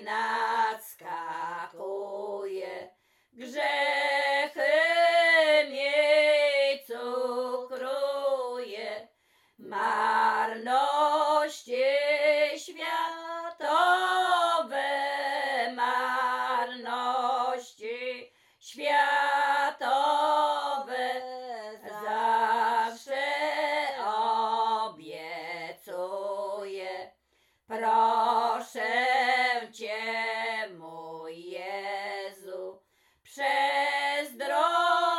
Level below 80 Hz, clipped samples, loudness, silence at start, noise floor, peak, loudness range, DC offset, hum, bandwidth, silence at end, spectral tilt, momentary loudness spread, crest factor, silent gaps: -88 dBFS; under 0.1%; -27 LUFS; 0 s; -71 dBFS; -12 dBFS; 9 LU; under 0.1%; none; 16 kHz; 0 s; -1.5 dB/octave; 15 LU; 16 dB; none